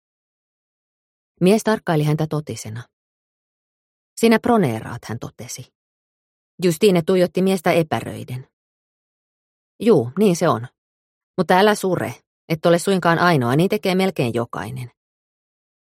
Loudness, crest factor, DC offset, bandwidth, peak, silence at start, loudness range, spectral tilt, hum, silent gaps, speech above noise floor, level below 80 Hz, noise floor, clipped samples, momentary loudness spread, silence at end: -19 LUFS; 20 dB; under 0.1%; 16.5 kHz; -2 dBFS; 1.4 s; 4 LU; -6 dB/octave; none; 2.93-4.16 s, 5.75-6.58 s, 8.53-9.79 s, 10.78-11.34 s, 12.27-12.48 s; over 72 dB; -60 dBFS; under -90 dBFS; under 0.1%; 17 LU; 1 s